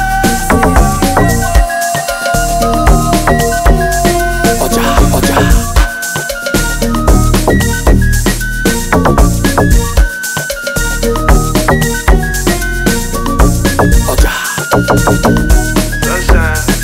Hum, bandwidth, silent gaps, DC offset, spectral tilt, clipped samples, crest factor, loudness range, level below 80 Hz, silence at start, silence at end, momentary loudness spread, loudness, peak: none; 16.5 kHz; none; under 0.1%; -4.5 dB/octave; 0.1%; 10 dB; 1 LU; -14 dBFS; 0 s; 0 s; 4 LU; -11 LUFS; 0 dBFS